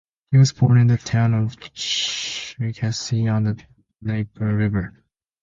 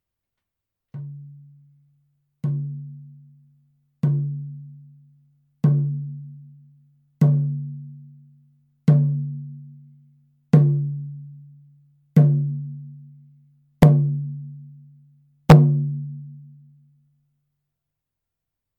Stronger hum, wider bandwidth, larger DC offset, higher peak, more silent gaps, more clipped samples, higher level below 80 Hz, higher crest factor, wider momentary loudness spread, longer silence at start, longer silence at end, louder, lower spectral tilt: neither; first, 7.6 kHz vs 6.6 kHz; neither; second, -4 dBFS vs 0 dBFS; neither; neither; about the same, -48 dBFS vs -48 dBFS; second, 16 dB vs 22 dB; second, 12 LU vs 26 LU; second, 0.3 s vs 0.95 s; second, 0.55 s vs 2.35 s; about the same, -21 LUFS vs -20 LUFS; second, -5.5 dB/octave vs -9.5 dB/octave